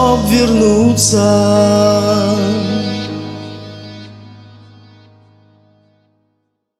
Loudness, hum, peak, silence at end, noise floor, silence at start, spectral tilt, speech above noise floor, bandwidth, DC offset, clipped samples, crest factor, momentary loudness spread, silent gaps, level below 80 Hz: -12 LUFS; none; 0 dBFS; 2.45 s; -67 dBFS; 0 s; -5 dB/octave; 57 dB; 15.5 kHz; under 0.1%; under 0.1%; 14 dB; 20 LU; none; -40 dBFS